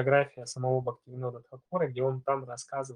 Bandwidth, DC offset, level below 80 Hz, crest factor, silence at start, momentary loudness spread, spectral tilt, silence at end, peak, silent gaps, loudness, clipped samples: 10.5 kHz; under 0.1%; -74 dBFS; 20 dB; 0 s; 11 LU; -6 dB/octave; 0 s; -10 dBFS; none; -32 LUFS; under 0.1%